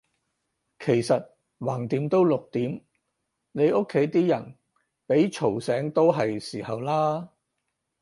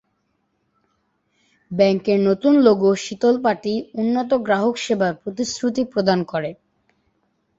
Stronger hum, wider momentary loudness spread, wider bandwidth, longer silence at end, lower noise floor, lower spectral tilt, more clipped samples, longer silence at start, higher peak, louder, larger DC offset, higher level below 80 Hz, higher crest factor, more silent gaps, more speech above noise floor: neither; about the same, 11 LU vs 11 LU; first, 11.5 kHz vs 8 kHz; second, 0.75 s vs 1.05 s; first, -80 dBFS vs -70 dBFS; first, -7 dB/octave vs -5.5 dB/octave; neither; second, 0.8 s vs 1.7 s; second, -8 dBFS vs -2 dBFS; second, -25 LUFS vs -19 LUFS; neither; second, -68 dBFS vs -60 dBFS; about the same, 18 dB vs 18 dB; neither; first, 56 dB vs 51 dB